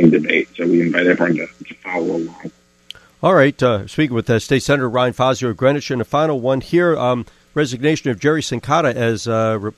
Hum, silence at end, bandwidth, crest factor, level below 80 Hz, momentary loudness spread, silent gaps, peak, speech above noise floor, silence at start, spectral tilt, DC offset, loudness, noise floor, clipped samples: none; 0.05 s; 13 kHz; 16 dB; -50 dBFS; 8 LU; none; 0 dBFS; 25 dB; 0 s; -6 dB/octave; under 0.1%; -17 LUFS; -42 dBFS; under 0.1%